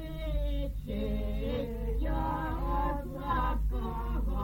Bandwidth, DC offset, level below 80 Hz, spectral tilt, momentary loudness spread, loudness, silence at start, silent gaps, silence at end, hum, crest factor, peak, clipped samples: 17 kHz; under 0.1%; -34 dBFS; -8 dB/octave; 4 LU; -34 LUFS; 0 s; none; 0 s; none; 14 dB; -18 dBFS; under 0.1%